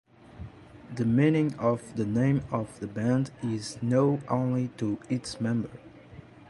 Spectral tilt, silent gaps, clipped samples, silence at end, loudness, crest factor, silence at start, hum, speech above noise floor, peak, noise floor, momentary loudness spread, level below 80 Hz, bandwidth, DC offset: -7.5 dB/octave; none; under 0.1%; 0.05 s; -28 LUFS; 18 dB; 0.3 s; none; 22 dB; -12 dBFS; -49 dBFS; 19 LU; -56 dBFS; 11.5 kHz; under 0.1%